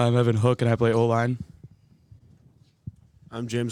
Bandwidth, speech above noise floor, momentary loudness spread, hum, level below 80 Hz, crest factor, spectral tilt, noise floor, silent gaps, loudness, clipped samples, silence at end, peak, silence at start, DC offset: 10.5 kHz; 36 dB; 24 LU; none; -58 dBFS; 18 dB; -7.5 dB/octave; -58 dBFS; none; -23 LUFS; under 0.1%; 0 s; -6 dBFS; 0 s; under 0.1%